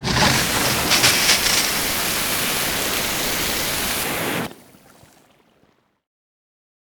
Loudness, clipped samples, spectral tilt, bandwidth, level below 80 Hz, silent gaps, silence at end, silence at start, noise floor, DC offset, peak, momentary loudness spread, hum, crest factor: -18 LUFS; under 0.1%; -1.5 dB/octave; over 20 kHz; -42 dBFS; none; 2.3 s; 0 s; -61 dBFS; under 0.1%; -2 dBFS; 8 LU; none; 20 dB